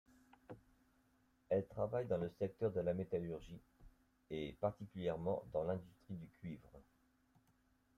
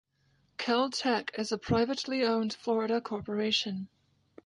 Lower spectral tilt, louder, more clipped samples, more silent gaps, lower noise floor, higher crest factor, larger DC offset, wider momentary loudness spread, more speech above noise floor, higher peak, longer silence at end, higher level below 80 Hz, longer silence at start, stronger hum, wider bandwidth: first, -8.5 dB/octave vs -4.5 dB/octave; second, -43 LUFS vs -30 LUFS; neither; neither; first, -76 dBFS vs -71 dBFS; about the same, 18 dB vs 18 dB; neither; first, 18 LU vs 8 LU; second, 34 dB vs 40 dB; second, -26 dBFS vs -14 dBFS; first, 1.15 s vs 0.6 s; second, -70 dBFS vs -60 dBFS; about the same, 0.5 s vs 0.6 s; neither; first, 13.5 kHz vs 11 kHz